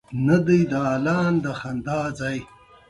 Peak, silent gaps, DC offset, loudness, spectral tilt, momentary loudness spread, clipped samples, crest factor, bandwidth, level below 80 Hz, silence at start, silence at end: -6 dBFS; none; under 0.1%; -22 LUFS; -7.5 dB/octave; 11 LU; under 0.1%; 16 dB; 11.5 kHz; -52 dBFS; 0.1 s; 0.45 s